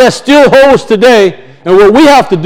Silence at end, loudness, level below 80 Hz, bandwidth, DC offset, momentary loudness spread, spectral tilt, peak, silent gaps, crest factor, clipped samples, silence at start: 0 s; -4 LUFS; -34 dBFS; 17.5 kHz; under 0.1%; 6 LU; -5 dB/octave; 0 dBFS; none; 4 dB; 10%; 0 s